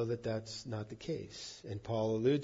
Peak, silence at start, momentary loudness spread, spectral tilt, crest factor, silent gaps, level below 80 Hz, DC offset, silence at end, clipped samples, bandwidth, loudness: -20 dBFS; 0 s; 13 LU; -6.5 dB/octave; 18 dB; none; -66 dBFS; under 0.1%; 0 s; under 0.1%; 7.4 kHz; -39 LUFS